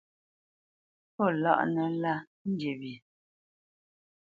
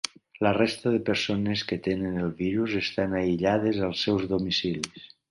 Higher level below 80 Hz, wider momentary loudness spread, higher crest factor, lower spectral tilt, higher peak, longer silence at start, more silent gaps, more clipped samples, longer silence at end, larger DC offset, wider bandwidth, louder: second, -78 dBFS vs -52 dBFS; first, 17 LU vs 5 LU; about the same, 24 dB vs 22 dB; first, -8.5 dB/octave vs -5.5 dB/octave; second, -10 dBFS vs -6 dBFS; first, 1.2 s vs 0.05 s; first, 2.27-2.45 s vs none; neither; first, 1.35 s vs 0.25 s; neither; second, 7.2 kHz vs 11.5 kHz; second, -30 LUFS vs -27 LUFS